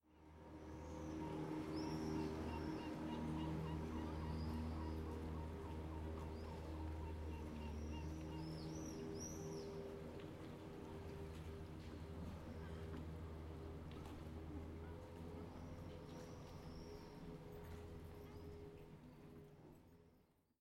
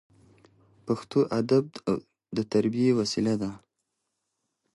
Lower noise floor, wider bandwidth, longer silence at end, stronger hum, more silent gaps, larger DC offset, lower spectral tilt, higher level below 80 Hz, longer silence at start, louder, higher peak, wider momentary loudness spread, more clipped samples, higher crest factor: second, -75 dBFS vs -81 dBFS; first, 16 kHz vs 11.5 kHz; second, 0.4 s vs 1.15 s; neither; neither; neither; about the same, -6.5 dB/octave vs -6.5 dB/octave; first, -56 dBFS vs -64 dBFS; second, 0.05 s vs 0.85 s; second, -51 LUFS vs -27 LUFS; second, -34 dBFS vs -10 dBFS; about the same, 10 LU vs 9 LU; neither; about the same, 16 dB vs 18 dB